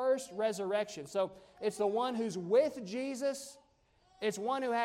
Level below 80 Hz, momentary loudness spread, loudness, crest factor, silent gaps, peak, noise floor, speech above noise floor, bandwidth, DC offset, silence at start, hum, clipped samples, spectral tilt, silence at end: -76 dBFS; 9 LU; -35 LUFS; 18 dB; none; -18 dBFS; -70 dBFS; 35 dB; 16 kHz; under 0.1%; 0 s; none; under 0.1%; -4.5 dB/octave; 0 s